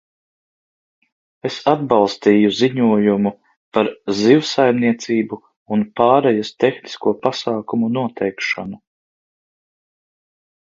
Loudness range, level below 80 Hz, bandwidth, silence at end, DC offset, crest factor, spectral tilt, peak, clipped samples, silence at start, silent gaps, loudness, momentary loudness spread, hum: 7 LU; -60 dBFS; 7.6 kHz; 1.85 s; under 0.1%; 18 dB; -6 dB/octave; 0 dBFS; under 0.1%; 1.45 s; 3.57-3.72 s, 5.57-5.66 s; -17 LUFS; 9 LU; none